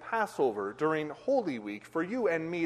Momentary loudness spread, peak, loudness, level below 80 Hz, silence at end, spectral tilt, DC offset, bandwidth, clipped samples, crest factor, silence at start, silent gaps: 6 LU; -16 dBFS; -32 LUFS; -74 dBFS; 0 s; -6.5 dB/octave; under 0.1%; 13 kHz; under 0.1%; 14 dB; 0 s; none